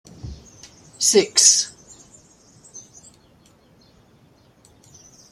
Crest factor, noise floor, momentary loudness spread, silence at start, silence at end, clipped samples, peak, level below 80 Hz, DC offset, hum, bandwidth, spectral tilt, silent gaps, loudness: 24 dB; -55 dBFS; 29 LU; 0.25 s; 2.5 s; under 0.1%; 0 dBFS; -54 dBFS; under 0.1%; none; 14 kHz; -1 dB/octave; none; -15 LUFS